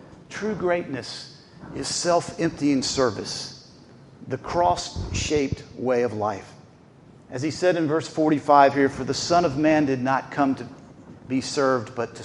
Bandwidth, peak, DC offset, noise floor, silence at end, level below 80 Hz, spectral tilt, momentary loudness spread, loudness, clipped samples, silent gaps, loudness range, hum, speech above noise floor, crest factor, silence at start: 11.5 kHz; -2 dBFS; under 0.1%; -50 dBFS; 0 s; -48 dBFS; -4.5 dB/octave; 13 LU; -23 LUFS; under 0.1%; none; 5 LU; none; 27 dB; 22 dB; 0 s